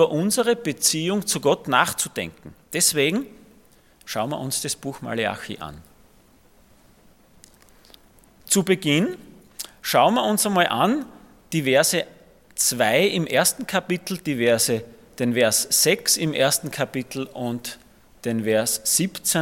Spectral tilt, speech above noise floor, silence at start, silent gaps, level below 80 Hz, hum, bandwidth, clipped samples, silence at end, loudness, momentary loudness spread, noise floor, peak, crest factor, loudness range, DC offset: -3 dB/octave; 33 dB; 0 s; none; -60 dBFS; none; 17.5 kHz; under 0.1%; 0 s; -21 LUFS; 14 LU; -55 dBFS; -2 dBFS; 22 dB; 9 LU; under 0.1%